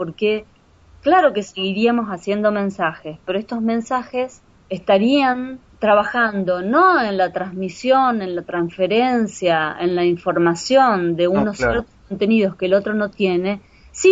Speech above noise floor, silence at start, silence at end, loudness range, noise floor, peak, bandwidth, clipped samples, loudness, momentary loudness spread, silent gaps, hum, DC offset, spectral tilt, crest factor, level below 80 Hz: 31 dB; 0 s; 0 s; 3 LU; -49 dBFS; -2 dBFS; 8 kHz; under 0.1%; -18 LUFS; 11 LU; none; none; under 0.1%; -5.5 dB/octave; 16 dB; -48 dBFS